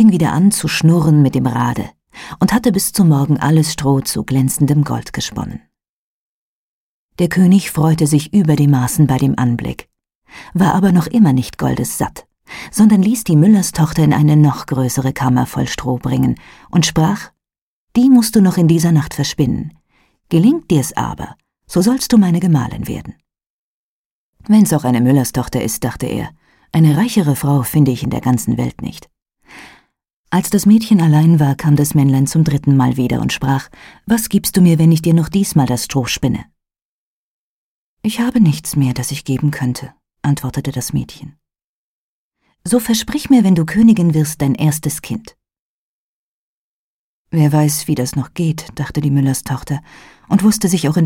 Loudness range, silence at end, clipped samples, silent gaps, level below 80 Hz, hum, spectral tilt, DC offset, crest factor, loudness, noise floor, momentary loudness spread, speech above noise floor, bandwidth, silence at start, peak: 6 LU; 0 s; under 0.1%; 5.89-7.09 s, 10.15-10.21 s, 17.62-17.88 s, 23.50-24.33 s, 30.13-30.24 s, 36.82-37.97 s, 41.64-42.31 s, 45.59-47.25 s; -42 dBFS; none; -6 dB/octave; under 0.1%; 14 dB; -14 LUFS; under -90 dBFS; 12 LU; over 77 dB; 17 kHz; 0 s; -2 dBFS